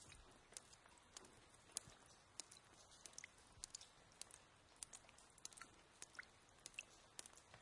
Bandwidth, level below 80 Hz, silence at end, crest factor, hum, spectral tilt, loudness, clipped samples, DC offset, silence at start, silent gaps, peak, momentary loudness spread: 12 kHz; -80 dBFS; 0 s; 40 dB; none; -0.5 dB/octave; -59 LUFS; under 0.1%; under 0.1%; 0 s; none; -22 dBFS; 11 LU